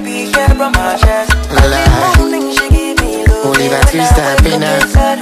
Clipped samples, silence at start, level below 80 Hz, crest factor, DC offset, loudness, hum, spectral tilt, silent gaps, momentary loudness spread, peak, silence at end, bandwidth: 0.6%; 0 s; -14 dBFS; 10 dB; under 0.1%; -10 LUFS; none; -5 dB/octave; none; 3 LU; 0 dBFS; 0 s; 15 kHz